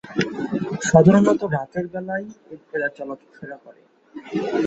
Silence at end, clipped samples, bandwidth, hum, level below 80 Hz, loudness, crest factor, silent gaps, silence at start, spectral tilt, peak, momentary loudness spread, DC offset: 0 s; under 0.1%; 8.2 kHz; none; -54 dBFS; -20 LUFS; 20 dB; none; 0.05 s; -6.5 dB/octave; -2 dBFS; 24 LU; under 0.1%